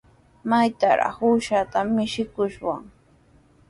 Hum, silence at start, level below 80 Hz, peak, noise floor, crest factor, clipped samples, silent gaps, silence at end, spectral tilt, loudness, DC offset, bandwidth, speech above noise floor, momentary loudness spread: none; 0.45 s; -56 dBFS; -8 dBFS; -56 dBFS; 16 dB; under 0.1%; none; 0.85 s; -5.5 dB/octave; -23 LUFS; under 0.1%; 11.5 kHz; 34 dB; 10 LU